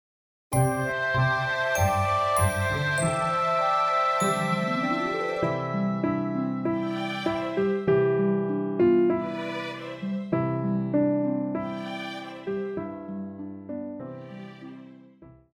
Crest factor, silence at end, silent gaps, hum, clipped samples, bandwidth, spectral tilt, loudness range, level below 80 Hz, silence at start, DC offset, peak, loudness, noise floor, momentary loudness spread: 16 dB; 0.25 s; none; none; under 0.1%; over 20 kHz; -6 dB/octave; 9 LU; -54 dBFS; 0.5 s; under 0.1%; -10 dBFS; -26 LUFS; -52 dBFS; 13 LU